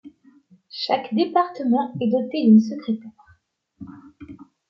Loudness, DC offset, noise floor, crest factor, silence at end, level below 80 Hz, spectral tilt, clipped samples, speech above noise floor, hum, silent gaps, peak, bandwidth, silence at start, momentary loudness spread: -21 LUFS; under 0.1%; -61 dBFS; 18 dB; 0.25 s; -66 dBFS; -7.5 dB/octave; under 0.1%; 41 dB; none; none; -4 dBFS; 6.2 kHz; 0.05 s; 26 LU